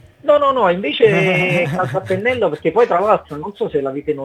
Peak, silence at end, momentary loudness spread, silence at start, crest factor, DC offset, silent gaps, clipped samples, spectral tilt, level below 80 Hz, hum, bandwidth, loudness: 0 dBFS; 0 s; 8 LU; 0.25 s; 16 dB; under 0.1%; none; under 0.1%; -6.5 dB/octave; -54 dBFS; none; 12.5 kHz; -16 LUFS